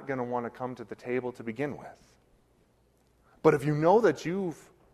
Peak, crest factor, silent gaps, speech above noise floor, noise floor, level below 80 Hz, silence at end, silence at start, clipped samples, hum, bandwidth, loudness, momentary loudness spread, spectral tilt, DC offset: -8 dBFS; 22 dB; none; 38 dB; -67 dBFS; -66 dBFS; 0.4 s; 0 s; under 0.1%; none; 13 kHz; -29 LUFS; 17 LU; -7.5 dB/octave; under 0.1%